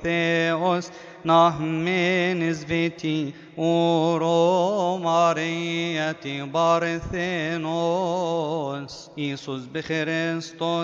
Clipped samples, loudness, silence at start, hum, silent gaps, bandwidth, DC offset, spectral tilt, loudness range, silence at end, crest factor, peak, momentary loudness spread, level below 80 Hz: under 0.1%; -23 LUFS; 0 s; none; none; 7.6 kHz; under 0.1%; -5.5 dB/octave; 4 LU; 0 s; 18 dB; -6 dBFS; 10 LU; -54 dBFS